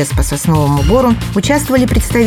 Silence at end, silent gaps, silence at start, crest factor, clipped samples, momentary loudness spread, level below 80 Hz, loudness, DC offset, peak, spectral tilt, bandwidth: 0 s; none; 0 s; 12 dB; under 0.1%; 4 LU; -20 dBFS; -12 LUFS; under 0.1%; 0 dBFS; -5.5 dB/octave; 18.5 kHz